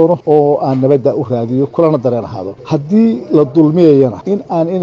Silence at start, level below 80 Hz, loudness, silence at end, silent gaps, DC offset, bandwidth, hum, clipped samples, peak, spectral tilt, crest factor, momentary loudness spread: 0 s; -52 dBFS; -12 LUFS; 0 s; none; under 0.1%; 7 kHz; none; under 0.1%; 0 dBFS; -10 dB/octave; 12 dB; 10 LU